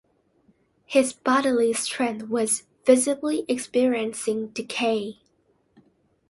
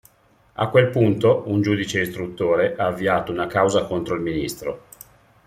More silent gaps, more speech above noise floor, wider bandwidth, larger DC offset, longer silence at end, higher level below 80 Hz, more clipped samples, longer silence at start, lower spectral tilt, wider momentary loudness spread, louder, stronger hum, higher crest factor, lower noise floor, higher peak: neither; first, 43 dB vs 37 dB; second, 12 kHz vs 16 kHz; neither; first, 1.2 s vs 0.7 s; second, -70 dBFS vs -52 dBFS; neither; first, 0.9 s vs 0.6 s; second, -3 dB/octave vs -6 dB/octave; about the same, 8 LU vs 10 LU; second, -24 LUFS vs -21 LUFS; neither; about the same, 20 dB vs 20 dB; first, -66 dBFS vs -58 dBFS; about the same, -4 dBFS vs -2 dBFS